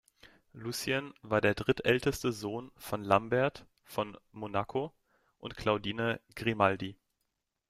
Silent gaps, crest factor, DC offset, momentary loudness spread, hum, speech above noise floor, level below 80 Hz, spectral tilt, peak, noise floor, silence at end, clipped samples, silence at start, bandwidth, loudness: none; 24 dB; under 0.1%; 13 LU; none; 51 dB; -60 dBFS; -5 dB/octave; -10 dBFS; -83 dBFS; 0.75 s; under 0.1%; 0.25 s; 16 kHz; -32 LUFS